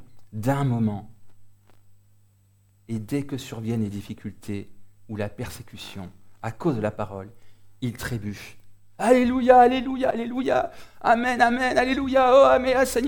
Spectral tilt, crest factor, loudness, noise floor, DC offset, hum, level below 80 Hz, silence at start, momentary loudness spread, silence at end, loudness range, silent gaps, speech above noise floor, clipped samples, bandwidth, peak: -6 dB/octave; 20 dB; -22 LUFS; -60 dBFS; under 0.1%; none; -50 dBFS; 0 s; 21 LU; 0 s; 13 LU; none; 38 dB; under 0.1%; 19 kHz; -4 dBFS